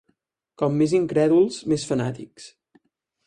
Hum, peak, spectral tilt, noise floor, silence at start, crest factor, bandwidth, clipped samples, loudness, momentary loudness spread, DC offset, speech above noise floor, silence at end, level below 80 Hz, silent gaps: none; -8 dBFS; -6.5 dB/octave; -71 dBFS; 0.6 s; 16 dB; 11 kHz; under 0.1%; -22 LUFS; 12 LU; under 0.1%; 49 dB; 0.8 s; -60 dBFS; none